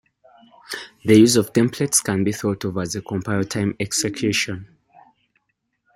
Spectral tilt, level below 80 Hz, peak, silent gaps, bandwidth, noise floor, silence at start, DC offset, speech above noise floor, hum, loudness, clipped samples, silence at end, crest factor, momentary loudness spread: -4.5 dB/octave; -58 dBFS; -2 dBFS; none; 16.5 kHz; -73 dBFS; 0.7 s; under 0.1%; 54 dB; none; -20 LUFS; under 0.1%; 1.3 s; 20 dB; 13 LU